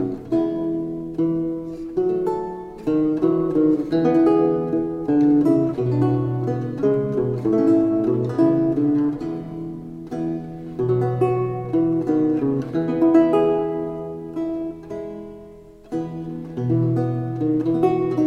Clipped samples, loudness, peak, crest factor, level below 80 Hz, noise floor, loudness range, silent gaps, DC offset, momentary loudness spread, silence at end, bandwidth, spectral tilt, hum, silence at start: under 0.1%; -21 LUFS; -6 dBFS; 16 dB; -50 dBFS; -43 dBFS; 6 LU; none; under 0.1%; 13 LU; 0 s; 5.6 kHz; -10 dB/octave; none; 0 s